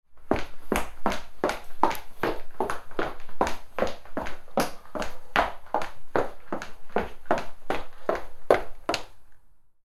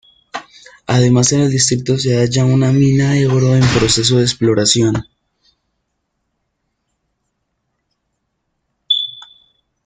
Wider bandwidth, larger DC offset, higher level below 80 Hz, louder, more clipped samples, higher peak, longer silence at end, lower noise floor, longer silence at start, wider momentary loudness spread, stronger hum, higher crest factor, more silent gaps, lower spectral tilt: first, 14 kHz vs 9.4 kHz; neither; about the same, -42 dBFS vs -44 dBFS; second, -30 LUFS vs -13 LUFS; neither; about the same, -2 dBFS vs 0 dBFS; second, 0.25 s vs 0.65 s; second, -48 dBFS vs -71 dBFS; second, 0.1 s vs 0.35 s; second, 9 LU vs 13 LU; neither; first, 26 dB vs 16 dB; neither; about the same, -4.5 dB/octave vs -5 dB/octave